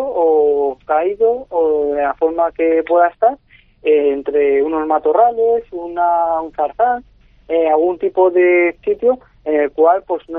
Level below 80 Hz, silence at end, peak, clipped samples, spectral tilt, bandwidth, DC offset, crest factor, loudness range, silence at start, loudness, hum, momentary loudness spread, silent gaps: -50 dBFS; 0 s; 0 dBFS; under 0.1%; -3.5 dB/octave; 3.8 kHz; under 0.1%; 14 dB; 1 LU; 0 s; -15 LUFS; none; 6 LU; none